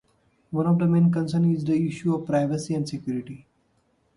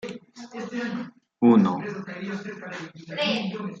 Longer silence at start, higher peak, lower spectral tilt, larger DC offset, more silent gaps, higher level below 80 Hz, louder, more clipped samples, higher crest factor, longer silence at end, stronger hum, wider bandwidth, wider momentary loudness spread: first, 0.5 s vs 0.05 s; second, -10 dBFS vs -6 dBFS; first, -8 dB/octave vs -6.5 dB/octave; neither; neither; first, -60 dBFS vs -70 dBFS; about the same, -24 LUFS vs -25 LUFS; neither; second, 14 dB vs 20 dB; first, 0.8 s vs 0 s; neither; first, 11 kHz vs 7.8 kHz; second, 12 LU vs 19 LU